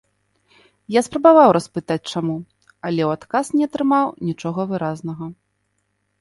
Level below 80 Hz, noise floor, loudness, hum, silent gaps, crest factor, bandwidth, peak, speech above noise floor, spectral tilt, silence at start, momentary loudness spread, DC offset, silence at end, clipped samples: -60 dBFS; -70 dBFS; -19 LUFS; 50 Hz at -55 dBFS; none; 20 dB; 11.5 kHz; 0 dBFS; 52 dB; -6.5 dB/octave; 0.9 s; 17 LU; under 0.1%; 0.85 s; under 0.1%